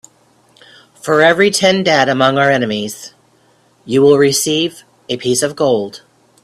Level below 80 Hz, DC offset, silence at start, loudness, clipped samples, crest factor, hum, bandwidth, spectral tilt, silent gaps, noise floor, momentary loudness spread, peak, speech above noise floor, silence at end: -56 dBFS; under 0.1%; 1.05 s; -13 LUFS; under 0.1%; 14 dB; none; 14.5 kHz; -3.5 dB/octave; none; -53 dBFS; 13 LU; 0 dBFS; 40 dB; 0.45 s